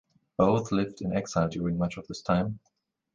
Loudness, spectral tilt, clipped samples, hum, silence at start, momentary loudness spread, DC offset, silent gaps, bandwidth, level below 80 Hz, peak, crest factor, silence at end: -29 LUFS; -7 dB/octave; under 0.1%; none; 0.4 s; 11 LU; under 0.1%; none; 7.6 kHz; -52 dBFS; -10 dBFS; 20 dB; 0.6 s